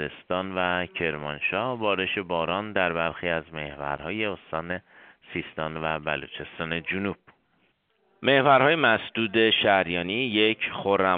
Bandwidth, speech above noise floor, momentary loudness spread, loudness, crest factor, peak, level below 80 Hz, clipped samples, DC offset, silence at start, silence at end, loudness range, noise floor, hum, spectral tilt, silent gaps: 4.7 kHz; 43 dB; 14 LU; -25 LUFS; 22 dB; -6 dBFS; -58 dBFS; under 0.1%; under 0.1%; 0 s; 0 s; 10 LU; -68 dBFS; none; -2 dB/octave; none